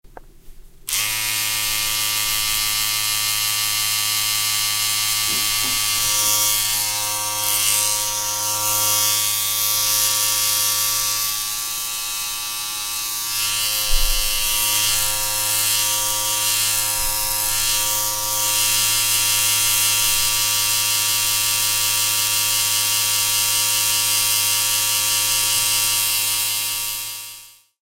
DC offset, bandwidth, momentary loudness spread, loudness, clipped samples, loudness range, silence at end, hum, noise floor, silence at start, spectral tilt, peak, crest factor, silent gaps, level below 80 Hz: under 0.1%; 16 kHz; 6 LU; -17 LUFS; under 0.1%; 3 LU; 0.35 s; none; -42 dBFS; 0.05 s; 1.5 dB/octave; -2 dBFS; 18 dB; none; -36 dBFS